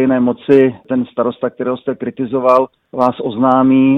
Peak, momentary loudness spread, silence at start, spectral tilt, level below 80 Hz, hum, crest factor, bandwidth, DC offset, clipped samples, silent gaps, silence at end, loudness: 0 dBFS; 9 LU; 0 s; -9 dB/octave; -56 dBFS; none; 14 dB; 5.2 kHz; under 0.1%; under 0.1%; none; 0 s; -15 LUFS